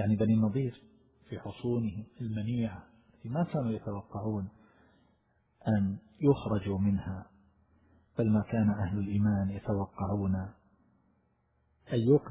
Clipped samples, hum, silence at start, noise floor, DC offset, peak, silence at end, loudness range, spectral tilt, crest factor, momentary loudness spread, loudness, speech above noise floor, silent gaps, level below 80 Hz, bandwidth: under 0.1%; none; 0 s; -73 dBFS; under 0.1%; -12 dBFS; 0 s; 5 LU; -9 dB/octave; 20 dB; 13 LU; -32 LUFS; 42 dB; none; -52 dBFS; 4 kHz